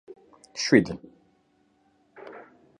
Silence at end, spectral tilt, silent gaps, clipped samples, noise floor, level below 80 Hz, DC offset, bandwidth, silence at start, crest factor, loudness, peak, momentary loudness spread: 0.4 s; -4.5 dB/octave; none; under 0.1%; -66 dBFS; -62 dBFS; under 0.1%; 10.5 kHz; 0.55 s; 26 dB; -23 LUFS; -4 dBFS; 26 LU